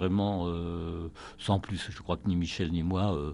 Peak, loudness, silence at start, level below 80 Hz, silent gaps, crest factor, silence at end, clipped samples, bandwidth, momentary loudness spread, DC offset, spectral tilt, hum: -12 dBFS; -32 LUFS; 0 s; -46 dBFS; none; 20 dB; 0 s; under 0.1%; 10.5 kHz; 9 LU; under 0.1%; -7 dB/octave; none